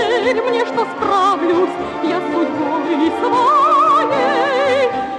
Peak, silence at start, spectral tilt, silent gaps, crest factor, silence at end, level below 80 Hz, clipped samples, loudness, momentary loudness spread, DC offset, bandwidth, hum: -4 dBFS; 0 s; -4.5 dB/octave; none; 12 dB; 0 s; -54 dBFS; under 0.1%; -15 LUFS; 7 LU; under 0.1%; 10.5 kHz; none